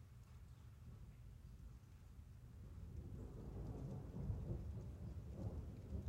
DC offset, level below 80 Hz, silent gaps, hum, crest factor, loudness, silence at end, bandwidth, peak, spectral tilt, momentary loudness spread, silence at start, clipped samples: under 0.1%; -56 dBFS; none; none; 18 dB; -54 LUFS; 0 s; 16 kHz; -34 dBFS; -8.5 dB/octave; 13 LU; 0 s; under 0.1%